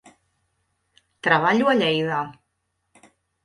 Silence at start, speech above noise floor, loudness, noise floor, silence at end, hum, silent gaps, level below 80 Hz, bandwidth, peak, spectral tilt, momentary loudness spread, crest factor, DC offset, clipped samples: 1.25 s; 55 dB; -20 LUFS; -75 dBFS; 1.15 s; none; none; -66 dBFS; 11.5 kHz; -4 dBFS; -5.5 dB/octave; 10 LU; 20 dB; under 0.1%; under 0.1%